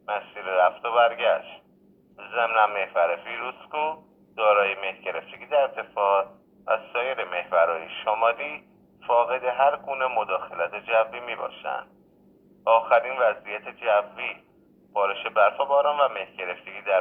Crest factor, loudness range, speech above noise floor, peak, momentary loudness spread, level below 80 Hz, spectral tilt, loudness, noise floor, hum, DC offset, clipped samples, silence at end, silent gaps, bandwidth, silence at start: 20 dB; 2 LU; 31 dB; -6 dBFS; 12 LU; -72 dBFS; -5.5 dB/octave; -25 LUFS; -58 dBFS; none; under 0.1%; under 0.1%; 0 s; none; 3.9 kHz; 0.1 s